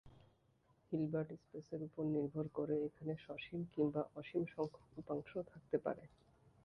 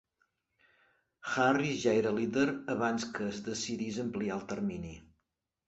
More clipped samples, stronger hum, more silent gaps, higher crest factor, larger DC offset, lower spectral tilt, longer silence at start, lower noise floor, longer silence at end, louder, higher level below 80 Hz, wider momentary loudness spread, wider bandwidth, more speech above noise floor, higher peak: neither; neither; neither; about the same, 20 dB vs 20 dB; neither; first, -9.5 dB/octave vs -5 dB/octave; second, 0.05 s vs 1.25 s; second, -75 dBFS vs -84 dBFS; about the same, 0.55 s vs 0.65 s; second, -43 LUFS vs -33 LUFS; second, -74 dBFS vs -64 dBFS; about the same, 9 LU vs 9 LU; second, 6.2 kHz vs 8.2 kHz; second, 33 dB vs 52 dB; second, -24 dBFS vs -14 dBFS